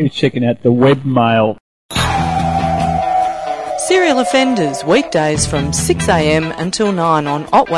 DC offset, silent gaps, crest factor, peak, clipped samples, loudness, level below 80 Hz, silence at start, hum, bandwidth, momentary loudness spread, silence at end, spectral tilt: under 0.1%; 1.60-1.89 s; 14 dB; 0 dBFS; under 0.1%; -14 LUFS; -36 dBFS; 0 s; none; 12 kHz; 6 LU; 0 s; -5 dB/octave